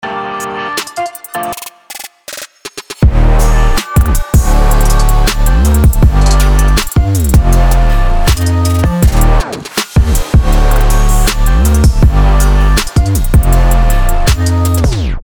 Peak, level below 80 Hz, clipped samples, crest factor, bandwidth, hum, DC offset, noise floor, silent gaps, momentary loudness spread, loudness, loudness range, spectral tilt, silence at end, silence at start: 0 dBFS; -10 dBFS; under 0.1%; 8 dB; over 20 kHz; none; under 0.1%; -30 dBFS; none; 10 LU; -11 LUFS; 4 LU; -5 dB/octave; 0.05 s; 0.05 s